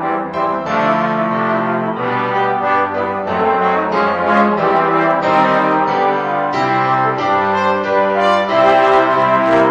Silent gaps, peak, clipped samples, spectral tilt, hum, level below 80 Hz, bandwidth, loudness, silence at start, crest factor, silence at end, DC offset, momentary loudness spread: none; 0 dBFS; under 0.1%; -6.5 dB/octave; none; -54 dBFS; 9.4 kHz; -14 LUFS; 0 s; 14 dB; 0 s; under 0.1%; 6 LU